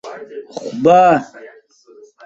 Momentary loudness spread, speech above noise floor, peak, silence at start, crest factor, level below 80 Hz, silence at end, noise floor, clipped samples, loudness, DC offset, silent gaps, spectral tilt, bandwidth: 22 LU; 32 dB; -2 dBFS; 0.05 s; 16 dB; -60 dBFS; 0.8 s; -46 dBFS; under 0.1%; -12 LUFS; under 0.1%; none; -6.5 dB/octave; 7.8 kHz